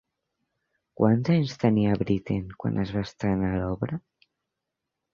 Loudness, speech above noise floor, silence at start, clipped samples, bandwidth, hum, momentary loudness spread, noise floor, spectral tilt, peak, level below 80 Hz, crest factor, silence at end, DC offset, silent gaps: -26 LUFS; 60 dB; 1 s; under 0.1%; 7.2 kHz; none; 8 LU; -85 dBFS; -8.5 dB/octave; -6 dBFS; -48 dBFS; 20 dB; 1.15 s; under 0.1%; none